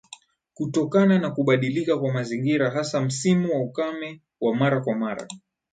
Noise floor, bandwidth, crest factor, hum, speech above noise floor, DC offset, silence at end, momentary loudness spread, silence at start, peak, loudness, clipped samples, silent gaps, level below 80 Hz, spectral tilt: -49 dBFS; 9.4 kHz; 16 dB; none; 26 dB; under 0.1%; 0.35 s; 12 LU; 0.1 s; -8 dBFS; -23 LUFS; under 0.1%; none; -68 dBFS; -6.5 dB/octave